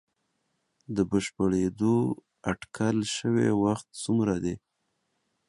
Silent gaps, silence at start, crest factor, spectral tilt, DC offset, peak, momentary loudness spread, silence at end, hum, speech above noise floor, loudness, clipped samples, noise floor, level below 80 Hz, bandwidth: none; 0.9 s; 18 dB; -6 dB/octave; under 0.1%; -12 dBFS; 9 LU; 0.9 s; none; 50 dB; -28 LUFS; under 0.1%; -77 dBFS; -56 dBFS; 11.5 kHz